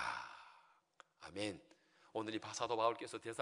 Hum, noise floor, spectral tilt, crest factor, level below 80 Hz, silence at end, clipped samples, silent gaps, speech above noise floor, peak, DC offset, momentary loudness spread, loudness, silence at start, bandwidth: none; -69 dBFS; -3.5 dB/octave; 22 dB; -80 dBFS; 0 s; under 0.1%; none; 27 dB; -22 dBFS; under 0.1%; 20 LU; -43 LUFS; 0 s; 11 kHz